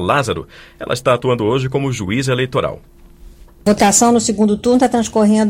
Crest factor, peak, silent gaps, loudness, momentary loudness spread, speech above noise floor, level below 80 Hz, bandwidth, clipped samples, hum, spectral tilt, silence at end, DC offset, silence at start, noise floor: 14 dB; 0 dBFS; none; -15 LUFS; 11 LU; 25 dB; -42 dBFS; 16.5 kHz; under 0.1%; none; -4.5 dB/octave; 0 s; under 0.1%; 0 s; -40 dBFS